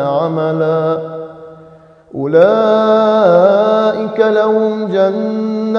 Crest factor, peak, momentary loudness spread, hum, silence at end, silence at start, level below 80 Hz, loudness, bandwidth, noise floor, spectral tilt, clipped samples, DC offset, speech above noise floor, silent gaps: 12 dB; 0 dBFS; 12 LU; none; 0 s; 0 s; -62 dBFS; -12 LUFS; 7 kHz; -41 dBFS; -8 dB/octave; under 0.1%; under 0.1%; 29 dB; none